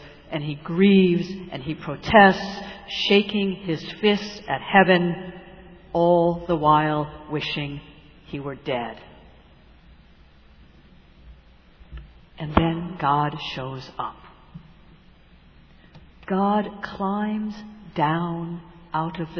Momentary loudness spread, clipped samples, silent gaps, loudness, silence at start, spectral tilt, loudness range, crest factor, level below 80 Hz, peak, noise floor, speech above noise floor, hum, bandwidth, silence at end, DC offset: 17 LU; under 0.1%; none; -22 LUFS; 0 s; -7 dB/octave; 14 LU; 22 dB; -46 dBFS; -2 dBFS; -51 dBFS; 29 dB; none; 5.4 kHz; 0 s; under 0.1%